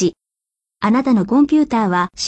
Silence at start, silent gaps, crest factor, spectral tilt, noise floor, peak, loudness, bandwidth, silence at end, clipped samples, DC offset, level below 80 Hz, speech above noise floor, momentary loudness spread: 0 s; none; 12 dB; -5.5 dB/octave; -84 dBFS; -4 dBFS; -16 LUFS; 8.4 kHz; 0 s; under 0.1%; under 0.1%; -52 dBFS; 69 dB; 6 LU